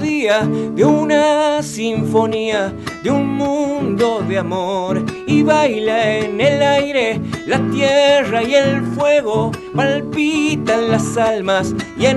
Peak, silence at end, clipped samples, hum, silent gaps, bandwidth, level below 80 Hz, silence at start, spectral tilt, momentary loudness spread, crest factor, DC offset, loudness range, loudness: -2 dBFS; 0 s; under 0.1%; none; none; 12 kHz; -48 dBFS; 0 s; -5.5 dB/octave; 6 LU; 12 dB; under 0.1%; 3 LU; -16 LUFS